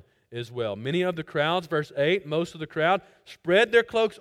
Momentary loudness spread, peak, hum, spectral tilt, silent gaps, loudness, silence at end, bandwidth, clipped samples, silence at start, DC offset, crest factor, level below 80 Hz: 12 LU; -6 dBFS; none; -5.5 dB/octave; none; -25 LUFS; 0.05 s; 13.5 kHz; under 0.1%; 0.3 s; under 0.1%; 20 dB; -66 dBFS